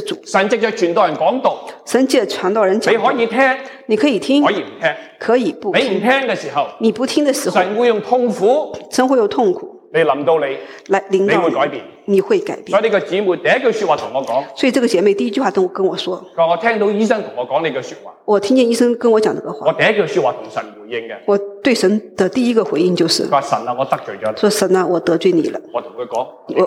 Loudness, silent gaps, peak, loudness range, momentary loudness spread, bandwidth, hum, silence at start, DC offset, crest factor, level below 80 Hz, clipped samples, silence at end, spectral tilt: -16 LUFS; none; -2 dBFS; 1 LU; 9 LU; 16 kHz; none; 0 s; under 0.1%; 14 dB; -66 dBFS; under 0.1%; 0 s; -4.5 dB/octave